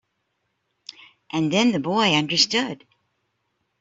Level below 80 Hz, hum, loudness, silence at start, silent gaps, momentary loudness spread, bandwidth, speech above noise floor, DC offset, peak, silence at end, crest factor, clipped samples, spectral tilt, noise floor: -66 dBFS; none; -20 LUFS; 0.9 s; none; 21 LU; 8 kHz; 54 dB; under 0.1%; -6 dBFS; 1.05 s; 20 dB; under 0.1%; -3.5 dB/octave; -74 dBFS